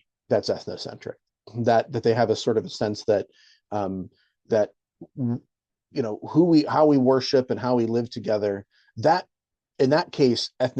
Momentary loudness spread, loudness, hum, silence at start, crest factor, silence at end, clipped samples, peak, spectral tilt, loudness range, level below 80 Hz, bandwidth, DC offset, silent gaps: 16 LU; -23 LUFS; none; 0.3 s; 18 dB; 0 s; under 0.1%; -6 dBFS; -6.5 dB/octave; 6 LU; -68 dBFS; 8.8 kHz; under 0.1%; none